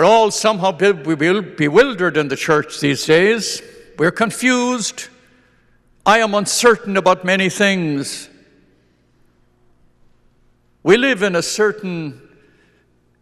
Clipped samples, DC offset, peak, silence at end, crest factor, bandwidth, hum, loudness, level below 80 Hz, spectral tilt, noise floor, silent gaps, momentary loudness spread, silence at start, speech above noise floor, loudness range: under 0.1%; under 0.1%; 0 dBFS; 1.05 s; 18 dB; 13 kHz; 60 Hz at -55 dBFS; -16 LUFS; -56 dBFS; -4 dB/octave; -57 dBFS; none; 11 LU; 0 s; 42 dB; 6 LU